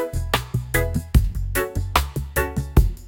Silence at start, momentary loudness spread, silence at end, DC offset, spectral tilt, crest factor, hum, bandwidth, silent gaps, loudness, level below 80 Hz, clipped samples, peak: 0 s; 4 LU; 0 s; under 0.1%; -5 dB/octave; 18 dB; none; 17 kHz; none; -23 LUFS; -24 dBFS; under 0.1%; -2 dBFS